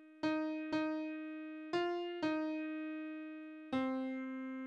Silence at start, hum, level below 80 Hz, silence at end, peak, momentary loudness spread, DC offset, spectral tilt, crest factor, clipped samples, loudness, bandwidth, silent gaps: 0 s; none; -80 dBFS; 0 s; -24 dBFS; 9 LU; under 0.1%; -5.5 dB/octave; 16 dB; under 0.1%; -40 LUFS; 7.8 kHz; none